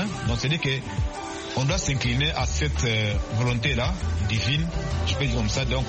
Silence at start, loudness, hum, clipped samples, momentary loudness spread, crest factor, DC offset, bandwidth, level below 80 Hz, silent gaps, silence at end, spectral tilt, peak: 0 s; -25 LUFS; none; under 0.1%; 4 LU; 14 dB; under 0.1%; 8.8 kHz; -32 dBFS; none; 0 s; -4.5 dB/octave; -10 dBFS